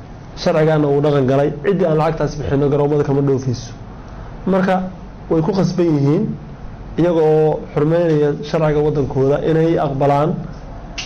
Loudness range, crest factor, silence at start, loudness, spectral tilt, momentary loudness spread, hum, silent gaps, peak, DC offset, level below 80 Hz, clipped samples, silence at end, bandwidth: 3 LU; 8 dB; 0 s; -16 LUFS; -8 dB/octave; 17 LU; none; none; -8 dBFS; under 0.1%; -36 dBFS; under 0.1%; 0 s; 7.2 kHz